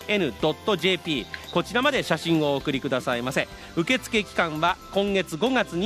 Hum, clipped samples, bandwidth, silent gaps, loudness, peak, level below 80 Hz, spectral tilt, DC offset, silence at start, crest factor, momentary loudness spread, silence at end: none; under 0.1%; 15 kHz; none; -25 LUFS; -6 dBFS; -52 dBFS; -4.5 dB/octave; under 0.1%; 0 s; 20 dB; 5 LU; 0 s